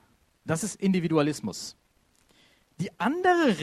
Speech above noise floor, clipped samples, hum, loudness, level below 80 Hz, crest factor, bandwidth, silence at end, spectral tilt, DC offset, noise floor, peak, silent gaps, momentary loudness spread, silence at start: 39 dB; under 0.1%; none; -27 LUFS; -66 dBFS; 18 dB; 14 kHz; 0 s; -5.5 dB/octave; under 0.1%; -65 dBFS; -10 dBFS; none; 15 LU; 0.45 s